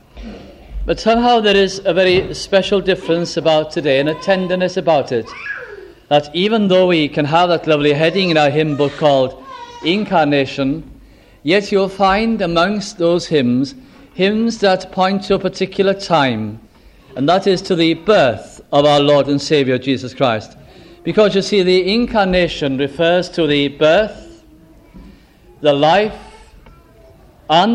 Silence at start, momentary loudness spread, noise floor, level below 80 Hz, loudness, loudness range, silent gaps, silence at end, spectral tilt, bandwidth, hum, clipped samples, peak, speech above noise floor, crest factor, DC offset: 0.15 s; 10 LU; -45 dBFS; -40 dBFS; -15 LUFS; 3 LU; none; 0 s; -5.5 dB/octave; 11 kHz; none; under 0.1%; 0 dBFS; 31 dB; 14 dB; under 0.1%